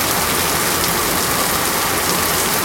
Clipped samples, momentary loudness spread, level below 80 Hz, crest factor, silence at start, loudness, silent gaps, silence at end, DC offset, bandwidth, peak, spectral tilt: under 0.1%; 1 LU; -40 dBFS; 18 dB; 0 s; -16 LUFS; none; 0 s; under 0.1%; 17 kHz; 0 dBFS; -2 dB/octave